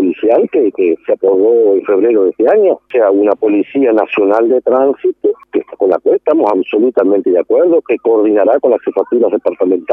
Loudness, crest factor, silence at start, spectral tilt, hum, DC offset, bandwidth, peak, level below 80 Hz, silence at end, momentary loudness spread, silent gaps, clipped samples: -12 LUFS; 10 dB; 0 s; -8.5 dB/octave; none; under 0.1%; 3.8 kHz; 0 dBFS; -66 dBFS; 0 s; 4 LU; none; under 0.1%